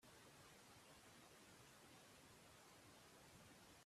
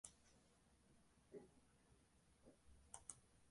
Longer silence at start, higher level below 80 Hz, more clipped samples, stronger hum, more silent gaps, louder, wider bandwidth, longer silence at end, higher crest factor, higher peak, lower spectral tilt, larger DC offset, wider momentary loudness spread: about the same, 0 s vs 0.05 s; second, -84 dBFS vs -78 dBFS; neither; neither; neither; second, -65 LUFS vs -62 LUFS; first, 15 kHz vs 11.5 kHz; about the same, 0 s vs 0 s; second, 12 dB vs 34 dB; second, -54 dBFS vs -34 dBFS; about the same, -3 dB/octave vs -3 dB/octave; neither; second, 1 LU vs 6 LU